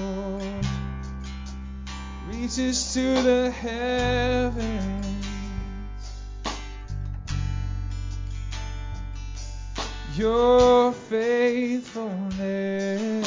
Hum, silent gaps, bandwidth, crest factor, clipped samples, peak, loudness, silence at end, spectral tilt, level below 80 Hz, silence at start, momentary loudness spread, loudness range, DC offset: none; none; 7.6 kHz; 18 dB; under 0.1%; -8 dBFS; -26 LUFS; 0 s; -5 dB/octave; -36 dBFS; 0 s; 16 LU; 11 LU; under 0.1%